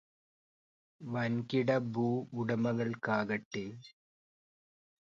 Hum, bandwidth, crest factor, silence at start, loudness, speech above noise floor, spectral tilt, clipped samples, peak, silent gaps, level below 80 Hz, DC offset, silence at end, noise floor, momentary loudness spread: none; 7.4 kHz; 18 dB; 1 s; -34 LUFS; over 56 dB; -7.5 dB/octave; under 0.1%; -18 dBFS; 3.45-3.51 s; -74 dBFS; under 0.1%; 1.2 s; under -90 dBFS; 10 LU